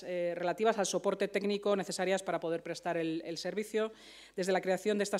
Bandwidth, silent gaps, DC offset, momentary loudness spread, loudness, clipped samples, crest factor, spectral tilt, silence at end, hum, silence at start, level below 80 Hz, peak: 15.5 kHz; none; under 0.1%; 6 LU; -34 LUFS; under 0.1%; 18 dB; -4 dB/octave; 0 s; none; 0 s; -76 dBFS; -16 dBFS